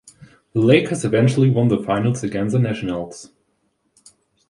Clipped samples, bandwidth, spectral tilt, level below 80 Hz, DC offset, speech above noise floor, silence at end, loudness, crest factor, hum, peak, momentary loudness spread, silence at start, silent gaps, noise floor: under 0.1%; 11.5 kHz; -7 dB/octave; -52 dBFS; under 0.1%; 50 dB; 1.25 s; -19 LUFS; 18 dB; none; -2 dBFS; 11 LU; 0.55 s; none; -68 dBFS